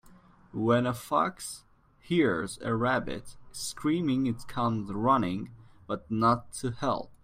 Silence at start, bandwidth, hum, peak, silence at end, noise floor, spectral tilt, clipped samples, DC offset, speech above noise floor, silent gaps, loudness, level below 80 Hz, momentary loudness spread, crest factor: 0.05 s; 16 kHz; none; -12 dBFS; 0.1 s; -56 dBFS; -5.5 dB/octave; under 0.1%; under 0.1%; 27 dB; none; -29 LUFS; -56 dBFS; 14 LU; 18 dB